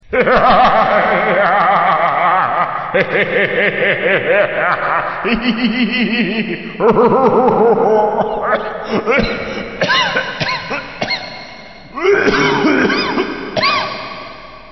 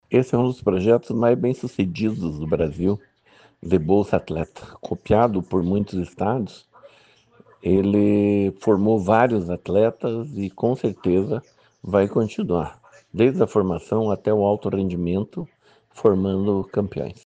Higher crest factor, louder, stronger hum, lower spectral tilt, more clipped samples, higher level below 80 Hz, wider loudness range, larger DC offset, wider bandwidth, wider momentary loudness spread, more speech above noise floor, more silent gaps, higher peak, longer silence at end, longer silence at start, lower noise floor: second, 12 dB vs 18 dB; first, -14 LUFS vs -22 LUFS; neither; second, -5.5 dB/octave vs -8.5 dB/octave; neither; first, -40 dBFS vs -48 dBFS; about the same, 4 LU vs 4 LU; first, 0.7% vs under 0.1%; second, 6.2 kHz vs 8.8 kHz; about the same, 10 LU vs 11 LU; second, 22 dB vs 34 dB; neither; about the same, -2 dBFS vs -2 dBFS; second, 0 s vs 0.15 s; about the same, 0.1 s vs 0.1 s; second, -35 dBFS vs -55 dBFS